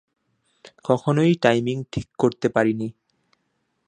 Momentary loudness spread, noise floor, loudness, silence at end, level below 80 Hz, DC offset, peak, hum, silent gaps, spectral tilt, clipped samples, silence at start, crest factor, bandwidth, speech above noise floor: 13 LU; -72 dBFS; -22 LUFS; 0.95 s; -56 dBFS; under 0.1%; 0 dBFS; none; none; -7 dB/octave; under 0.1%; 0.85 s; 22 dB; 10 kHz; 52 dB